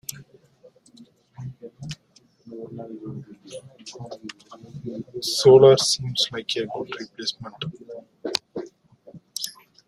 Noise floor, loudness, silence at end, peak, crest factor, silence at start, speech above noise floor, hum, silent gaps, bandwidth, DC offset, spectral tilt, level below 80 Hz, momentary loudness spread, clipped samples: -59 dBFS; -21 LUFS; 0.35 s; -2 dBFS; 22 dB; 0.1 s; 37 dB; none; none; 14.5 kHz; under 0.1%; -4 dB/octave; -62 dBFS; 26 LU; under 0.1%